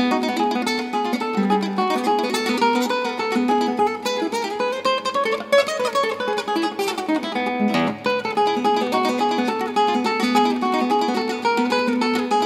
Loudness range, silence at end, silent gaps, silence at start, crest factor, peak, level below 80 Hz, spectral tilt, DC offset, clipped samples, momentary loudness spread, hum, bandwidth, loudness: 1 LU; 0 s; none; 0 s; 16 dB; -4 dBFS; -68 dBFS; -4 dB/octave; under 0.1%; under 0.1%; 4 LU; none; 16 kHz; -21 LUFS